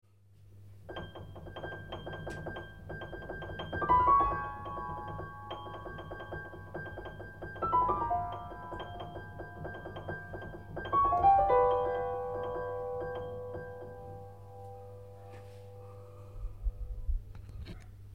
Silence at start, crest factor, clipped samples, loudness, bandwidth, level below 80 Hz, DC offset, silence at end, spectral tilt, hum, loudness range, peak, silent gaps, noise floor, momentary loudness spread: 0.05 s; 20 dB; under 0.1%; -34 LUFS; 15.5 kHz; -46 dBFS; 0.1%; 0 s; -7.5 dB/octave; none; 15 LU; -16 dBFS; none; -60 dBFS; 22 LU